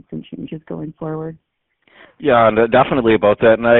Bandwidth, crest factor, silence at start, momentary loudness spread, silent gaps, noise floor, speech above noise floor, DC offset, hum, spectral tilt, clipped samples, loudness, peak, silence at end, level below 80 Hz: 4.1 kHz; 16 dB; 0.1 s; 18 LU; none; -55 dBFS; 40 dB; under 0.1%; none; -4.5 dB/octave; under 0.1%; -14 LUFS; 0 dBFS; 0 s; -46 dBFS